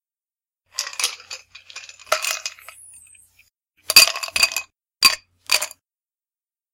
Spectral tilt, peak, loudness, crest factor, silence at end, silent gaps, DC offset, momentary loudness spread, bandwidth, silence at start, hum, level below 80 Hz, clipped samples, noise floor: 2.5 dB/octave; 0 dBFS; -18 LUFS; 24 dB; 1.05 s; none; under 0.1%; 25 LU; 17 kHz; 0.8 s; none; -64 dBFS; under 0.1%; under -90 dBFS